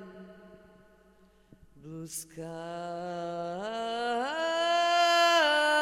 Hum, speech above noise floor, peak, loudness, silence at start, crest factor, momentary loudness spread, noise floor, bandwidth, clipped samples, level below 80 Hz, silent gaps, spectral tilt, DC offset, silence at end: none; 24 dB; -14 dBFS; -28 LUFS; 0 s; 16 dB; 18 LU; -61 dBFS; 16 kHz; under 0.1%; -68 dBFS; none; -2.5 dB/octave; under 0.1%; 0 s